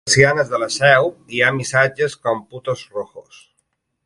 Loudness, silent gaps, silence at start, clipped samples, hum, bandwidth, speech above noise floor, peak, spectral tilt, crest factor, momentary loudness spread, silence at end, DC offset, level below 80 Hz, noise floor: -17 LUFS; none; 0.05 s; under 0.1%; none; 11.5 kHz; 52 dB; 0 dBFS; -3.5 dB/octave; 18 dB; 13 LU; 0.85 s; under 0.1%; -54 dBFS; -70 dBFS